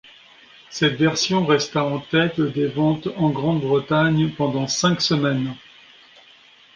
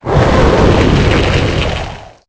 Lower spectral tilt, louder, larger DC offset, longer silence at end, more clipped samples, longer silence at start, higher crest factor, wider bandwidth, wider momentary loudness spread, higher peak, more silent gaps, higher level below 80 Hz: second, -5 dB/octave vs -6.5 dB/octave; second, -20 LUFS vs -11 LUFS; neither; first, 1.2 s vs 0.2 s; neither; first, 0.7 s vs 0.05 s; first, 18 dB vs 10 dB; first, 9.4 kHz vs 8 kHz; second, 5 LU vs 9 LU; second, -4 dBFS vs 0 dBFS; neither; second, -54 dBFS vs -18 dBFS